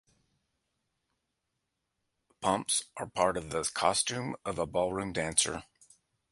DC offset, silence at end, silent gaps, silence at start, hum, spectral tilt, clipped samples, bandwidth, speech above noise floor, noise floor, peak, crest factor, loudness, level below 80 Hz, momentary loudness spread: under 0.1%; 0.7 s; none; 2.4 s; none; -2.5 dB/octave; under 0.1%; 11.5 kHz; 52 dB; -84 dBFS; -10 dBFS; 24 dB; -31 LUFS; -60 dBFS; 8 LU